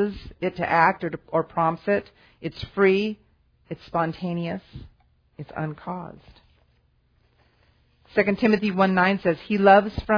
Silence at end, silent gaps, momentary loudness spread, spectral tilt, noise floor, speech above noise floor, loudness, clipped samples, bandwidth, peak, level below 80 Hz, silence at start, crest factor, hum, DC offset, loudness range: 0 s; none; 17 LU; -8 dB/octave; -64 dBFS; 41 dB; -23 LUFS; under 0.1%; 5.2 kHz; -4 dBFS; -50 dBFS; 0 s; 22 dB; none; under 0.1%; 14 LU